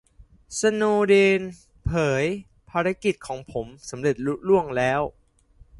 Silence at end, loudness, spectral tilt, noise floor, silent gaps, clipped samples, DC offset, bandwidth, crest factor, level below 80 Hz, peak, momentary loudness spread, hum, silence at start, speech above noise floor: 0.7 s; -23 LUFS; -5.5 dB/octave; -54 dBFS; none; under 0.1%; under 0.1%; 11.5 kHz; 18 dB; -48 dBFS; -6 dBFS; 15 LU; none; 0.2 s; 32 dB